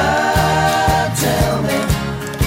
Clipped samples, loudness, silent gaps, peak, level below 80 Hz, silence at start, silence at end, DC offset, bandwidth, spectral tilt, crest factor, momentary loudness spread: under 0.1%; -16 LUFS; none; -6 dBFS; -28 dBFS; 0 s; 0 s; under 0.1%; 16.5 kHz; -4.5 dB/octave; 10 dB; 5 LU